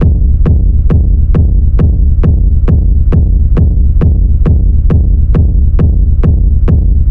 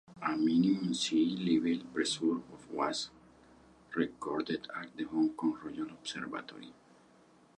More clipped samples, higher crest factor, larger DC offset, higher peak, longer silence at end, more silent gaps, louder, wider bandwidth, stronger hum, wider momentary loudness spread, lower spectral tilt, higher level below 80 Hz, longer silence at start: neither; second, 6 dB vs 18 dB; first, 4% vs under 0.1%; first, 0 dBFS vs -18 dBFS; second, 0 s vs 0.85 s; neither; first, -10 LUFS vs -34 LUFS; second, 3 kHz vs 11 kHz; neither; second, 1 LU vs 13 LU; first, -12 dB/octave vs -4.5 dB/octave; first, -8 dBFS vs -72 dBFS; about the same, 0 s vs 0.1 s